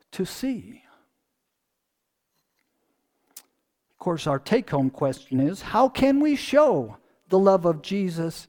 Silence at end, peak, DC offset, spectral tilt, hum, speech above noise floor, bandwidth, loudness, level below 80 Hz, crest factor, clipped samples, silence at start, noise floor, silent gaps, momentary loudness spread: 0.05 s; -6 dBFS; under 0.1%; -6.5 dB/octave; none; 57 dB; 18.5 kHz; -23 LUFS; -56 dBFS; 20 dB; under 0.1%; 0.15 s; -80 dBFS; none; 11 LU